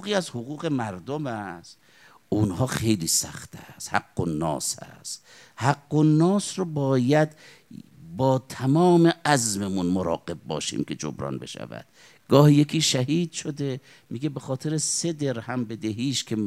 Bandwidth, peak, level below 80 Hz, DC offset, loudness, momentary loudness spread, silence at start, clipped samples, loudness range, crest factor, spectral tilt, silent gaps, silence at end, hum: 15 kHz; -2 dBFS; -60 dBFS; under 0.1%; -24 LUFS; 17 LU; 0 s; under 0.1%; 4 LU; 22 dB; -5 dB/octave; none; 0 s; none